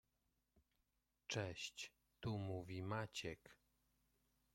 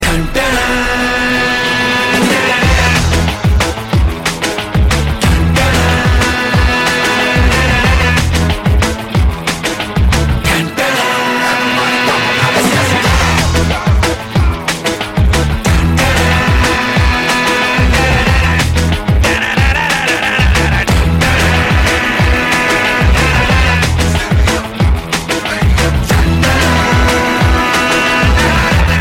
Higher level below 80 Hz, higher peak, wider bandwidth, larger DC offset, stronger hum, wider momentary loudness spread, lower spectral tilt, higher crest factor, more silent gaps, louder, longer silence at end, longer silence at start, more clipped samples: second, -76 dBFS vs -16 dBFS; second, -30 dBFS vs 0 dBFS; about the same, 16.5 kHz vs 16.5 kHz; neither; neither; first, 9 LU vs 4 LU; about the same, -4.5 dB/octave vs -4.5 dB/octave; first, 20 dB vs 10 dB; neither; second, -49 LUFS vs -11 LUFS; first, 1 s vs 0 s; first, 1.3 s vs 0 s; neither